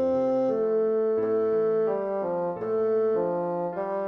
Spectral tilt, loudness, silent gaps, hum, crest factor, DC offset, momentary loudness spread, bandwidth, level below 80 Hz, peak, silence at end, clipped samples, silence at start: -9.5 dB/octave; -26 LUFS; none; none; 8 dB; under 0.1%; 5 LU; 5.6 kHz; -68 dBFS; -16 dBFS; 0 s; under 0.1%; 0 s